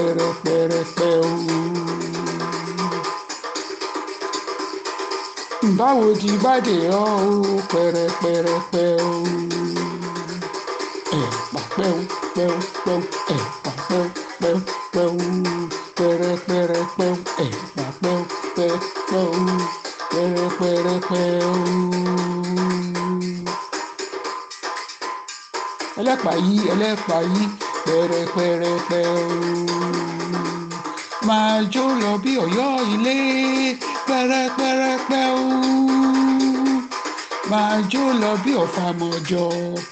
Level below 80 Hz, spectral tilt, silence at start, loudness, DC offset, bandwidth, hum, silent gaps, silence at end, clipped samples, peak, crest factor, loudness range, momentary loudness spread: -62 dBFS; -5.5 dB/octave; 0 s; -21 LUFS; under 0.1%; 9 kHz; none; none; 0 s; under 0.1%; -6 dBFS; 16 dB; 6 LU; 10 LU